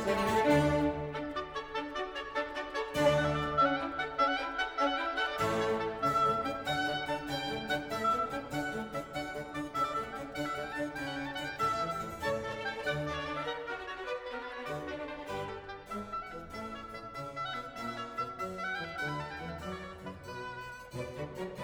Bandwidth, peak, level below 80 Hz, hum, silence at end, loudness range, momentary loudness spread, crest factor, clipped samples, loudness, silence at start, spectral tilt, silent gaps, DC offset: over 20 kHz; -14 dBFS; -56 dBFS; none; 0 s; 9 LU; 13 LU; 20 dB; under 0.1%; -34 LUFS; 0 s; -5 dB/octave; none; under 0.1%